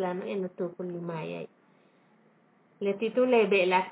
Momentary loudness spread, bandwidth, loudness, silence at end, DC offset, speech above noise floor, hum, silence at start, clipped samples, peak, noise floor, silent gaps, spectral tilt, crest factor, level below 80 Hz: 15 LU; 4 kHz; -28 LUFS; 0 s; under 0.1%; 36 dB; none; 0 s; under 0.1%; -12 dBFS; -64 dBFS; none; -9.5 dB/octave; 18 dB; -88 dBFS